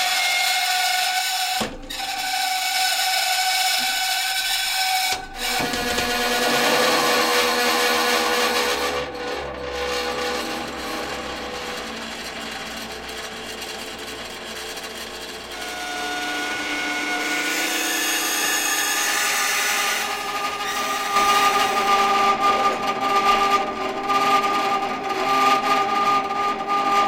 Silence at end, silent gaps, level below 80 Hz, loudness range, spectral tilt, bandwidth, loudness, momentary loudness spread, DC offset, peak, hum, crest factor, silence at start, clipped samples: 0 s; none; -50 dBFS; 11 LU; -0.5 dB/octave; 16.5 kHz; -21 LUFS; 12 LU; under 0.1%; -6 dBFS; none; 16 dB; 0 s; under 0.1%